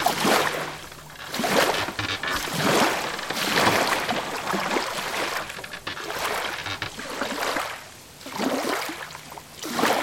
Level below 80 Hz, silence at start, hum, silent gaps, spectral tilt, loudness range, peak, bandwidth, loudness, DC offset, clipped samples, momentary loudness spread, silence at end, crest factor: -54 dBFS; 0 s; none; none; -2.5 dB/octave; 6 LU; -4 dBFS; 17 kHz; -25 LUFS; under 0.1%; under 0.1%; 15 LU; 0 s; 22 dB